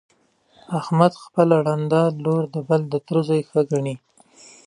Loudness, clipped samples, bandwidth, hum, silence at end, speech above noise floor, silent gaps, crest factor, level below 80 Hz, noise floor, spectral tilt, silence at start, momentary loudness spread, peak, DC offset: -21 LUFS; under 0.1%; 11 kHz; none; 0.7 s; 38 dB; none; 20 dB; -68 dBFS; -58 dBFS; -8 dB/octave; 0.7 s; 9 LU; -2 dBFS; under 0.1%